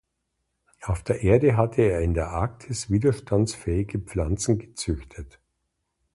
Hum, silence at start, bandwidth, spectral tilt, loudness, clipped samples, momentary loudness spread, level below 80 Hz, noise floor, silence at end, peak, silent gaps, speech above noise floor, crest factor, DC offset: none; 0.8 s; 11.5 kHz; -6.5 dB/octave; -25 LUFS; under 0.1%; 12 LU; -38 dBFS; -78 dBFS; 0.85 s; -6 dBFS; none; 54 dB; 20 dB; under 0.1%